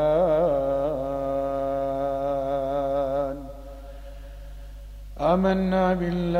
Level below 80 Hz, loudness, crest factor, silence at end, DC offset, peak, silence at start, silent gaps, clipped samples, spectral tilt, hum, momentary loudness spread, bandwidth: -40 dBFS; -25 LUFS; 16 dB; 0 s; under 0.1%; -8 dBFS; 0 s; none; under 0.1%; -8.5 dB/octave; 50 Hz at -55 dBFS; 22 LU; 15 kHz